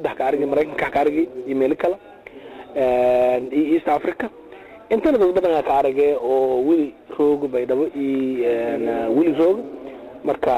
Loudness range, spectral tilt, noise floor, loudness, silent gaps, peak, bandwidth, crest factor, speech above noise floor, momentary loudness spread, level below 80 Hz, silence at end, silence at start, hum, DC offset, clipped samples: 2 LU; -7 dB/octave; -39 dBFS; -20 LUFS; none; -8 dBFS; 15.5 kHz; 12 dB; 20 dB; 12 LU; -52 dBFS; 0 s; 0 s; none; under 0.1%; under 0.1%